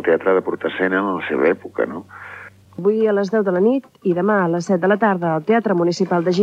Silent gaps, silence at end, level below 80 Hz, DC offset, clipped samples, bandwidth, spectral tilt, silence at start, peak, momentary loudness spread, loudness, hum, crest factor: none; 0 s; -68 dBFS; under 0.1%; under 0.1%; 8.8 kHz; -7 dB/octave; 0 s; -4 dBFS; 8 LU; -18 LUFS; none; 14 dB